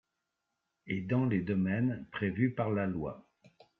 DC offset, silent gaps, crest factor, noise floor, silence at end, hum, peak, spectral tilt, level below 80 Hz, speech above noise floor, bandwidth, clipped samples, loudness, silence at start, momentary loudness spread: under 0.1%; none; 18 dB; -85 dBFS; 0.6 s; none; -16 dBFS; -7.5 dB/octave; -66 dBFS; 53 dB; 4.3 kHz; under 0.1%; -33 LUFS; 0.85 s; 9 LU